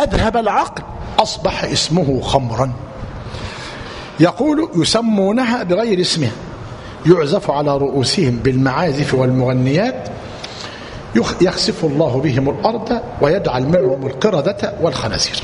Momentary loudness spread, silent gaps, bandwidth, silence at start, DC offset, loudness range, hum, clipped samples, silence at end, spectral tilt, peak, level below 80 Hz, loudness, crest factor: 14 LU; none; 11 kHz; 0 s; under 0.1%; 2 LU; none; under 0.1%; 0 s; -5.5 dB/octave; 0 dBFS; -36 dBFS; -16 LUFS; 16 dB